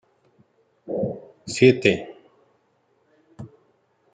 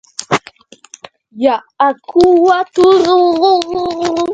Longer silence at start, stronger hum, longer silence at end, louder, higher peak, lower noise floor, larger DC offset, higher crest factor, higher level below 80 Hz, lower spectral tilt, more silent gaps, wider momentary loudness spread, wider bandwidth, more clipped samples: first, 0.85 s vs 0.2 s; neither; first, 0.7 s vs 0 s; second, -21 LUFS vs -12 LUFS; about the same, -2 dBFS vs 0 dBFS; first, -66 dBFS vs -41 dBFS; neither; first, 24 dB vs 12 dB; second, -62 dBFS vs -48 dBFS; about the same, -5.5 dB/octave vs -4.5 dB/octave; neither; first, 27 LU vs 9 LU; about the same, 9.4 kHz vs 9.4 kHz; neither